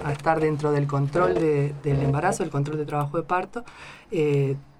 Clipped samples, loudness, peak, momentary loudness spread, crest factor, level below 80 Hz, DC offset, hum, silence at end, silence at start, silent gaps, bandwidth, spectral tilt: under 0.1%; -24 LUFS; -6 dBFS; 8 LU; 18 dB; -50 dBFS; under 0.1%; none; 0.15 s; 0 s; none; 12 kHz; -7.5 dB/octave